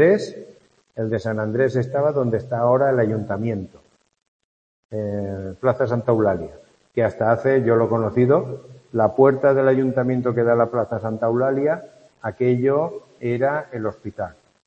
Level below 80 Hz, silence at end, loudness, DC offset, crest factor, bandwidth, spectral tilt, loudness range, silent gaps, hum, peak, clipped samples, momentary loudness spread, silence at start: -58 dBFS; 0.35 s; -21 LUFS; under 0.1%; 20 dB; 8.6 kHz; -9 dB/octave; 6 LU; 4.28-4.89 s; none; -2 dBFS; under 0.1%; 14 LU; 0 s